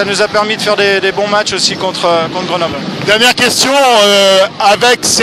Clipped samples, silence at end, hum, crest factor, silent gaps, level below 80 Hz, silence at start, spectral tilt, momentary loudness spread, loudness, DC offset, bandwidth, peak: 0.3%; 0 s; none; 10 dB; none; -48 dBFS; 0 s; -2 dB/octave; 8 LU; -9 LUFS; under 0.1%; 16 kHz; 0 dBFS